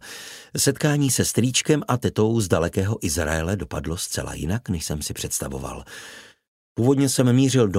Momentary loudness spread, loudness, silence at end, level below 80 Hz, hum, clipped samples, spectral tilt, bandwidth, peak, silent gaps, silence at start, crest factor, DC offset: 16 LU; -22 LUFS; 0 s; -42 dBFS; none; under 0.1%; -4.5 dB/octave; 16 kHz; -4 dBFS; 6.48-6.76 s; 0.05 s; 18 dB; under 0.1%